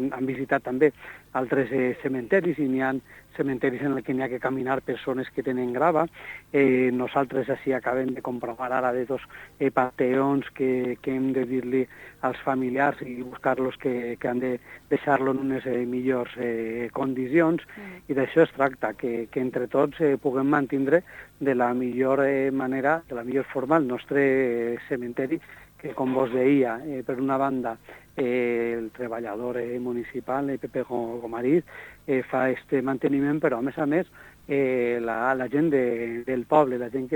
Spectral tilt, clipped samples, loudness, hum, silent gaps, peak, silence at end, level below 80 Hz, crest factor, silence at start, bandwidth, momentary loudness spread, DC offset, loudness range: -8 dB/octave; under 0.1%; -26 LUFS; none; none; -6 dBFS; 0 s; -60 dBFS; 20 dB; 0 s; 19 kHz; 9 LU; under 0.1%; 3 LU